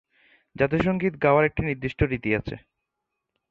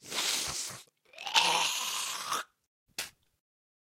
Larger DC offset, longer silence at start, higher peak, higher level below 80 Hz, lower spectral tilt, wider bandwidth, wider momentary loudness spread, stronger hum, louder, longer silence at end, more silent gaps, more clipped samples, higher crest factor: neither; first, 0.6 s vs 0.05 s; about the same, -6 dBFS vs -8 dBFS; first, -42 dBFS vs -70 dBFS; first, -9 dB/octave vs 1 dB/octave; second, 7.4 kHz vs 16 kHz; second, 8 LU vs 17 LU; neither; first, -24 LUFS vs -30 LUFS; about the same, 0.9 s vs 0.9 s; second, none vs 2.67-2.86 s; neither; second, 18 dB vs 26 dB